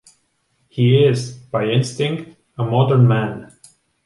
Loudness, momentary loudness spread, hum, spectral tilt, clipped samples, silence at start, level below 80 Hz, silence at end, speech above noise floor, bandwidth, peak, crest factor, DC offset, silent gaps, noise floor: -17 LUFS; 16 LU; none; -7 dB/octave; under 0.1%; 0.75 s; -58 dBFS; 0.6 s; 49 dB; 11.5 kHz; -2 dBFS; 16 dB; under 0.1%; none; -65 dBFS